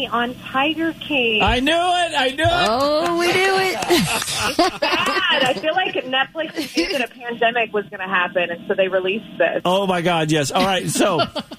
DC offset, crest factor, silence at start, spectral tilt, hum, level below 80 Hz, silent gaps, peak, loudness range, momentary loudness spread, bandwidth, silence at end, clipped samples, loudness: under 0.1%; 14 dB; 0 s; -3.5 dB/octave; none; -42 dBFS; none; -6 dBFS; 3 LU; 6 LU; 15.5 kHz; 0 s; under 0.1%; -19 LUFS